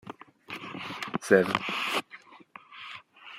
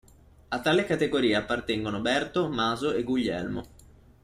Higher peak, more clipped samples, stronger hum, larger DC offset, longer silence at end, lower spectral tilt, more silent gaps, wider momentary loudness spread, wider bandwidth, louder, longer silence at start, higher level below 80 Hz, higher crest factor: first, -6 dBFS vs -12 dBFS; neither; neither; neither; second, 0 s vs 0.55 s; about the same, -4.5 dB/octave vs -5 dB/octave; neither; first, 26 LU vs 8 LU; first, 16 kHz vs 14.5 kHz; about the same, -28 LUFS vs -27 LUFS; second, 0.05 s vs 0.5 s; second, -74 dBFS vs -54 dBFS; first, 26 dB vs 16 dB